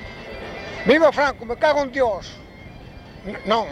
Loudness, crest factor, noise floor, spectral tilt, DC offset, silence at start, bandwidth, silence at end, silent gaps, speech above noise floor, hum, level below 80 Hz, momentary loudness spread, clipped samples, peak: -20 LUFS; 18 dB; -40 dBFS; -5 dB/octave; under 0.1%; 0 s; 11.5 kHz; 0 s; none; 21 dB; none; -46 dBFS; 25 LU; under 0.1%; -4 dBFS